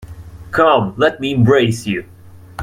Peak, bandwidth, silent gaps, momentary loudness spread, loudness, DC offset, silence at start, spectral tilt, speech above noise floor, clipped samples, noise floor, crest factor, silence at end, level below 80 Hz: 0 dBFS; 14.5 kHz; none; 22 LU; -15 LUFS; under 0.1%; 0 s; -6.5 dB/octave; 20 dB; under 0.1%; -34 dBFS; 16 dB; 0 s; -44 dBFS